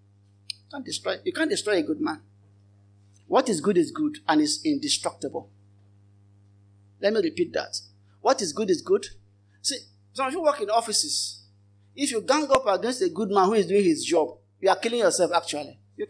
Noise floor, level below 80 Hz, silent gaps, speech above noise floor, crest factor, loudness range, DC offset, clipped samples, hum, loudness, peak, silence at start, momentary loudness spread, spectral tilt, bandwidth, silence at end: -58 dBFS; -66 dBFS; none; 34 dB; 18 dB; 6 LU; under 0.1%; under 0.1%; none; -25 LUFS; -8 dBFS; 0.75 s; 13 LU; -3 dB/octave; 10.5 kHz; 0.05 s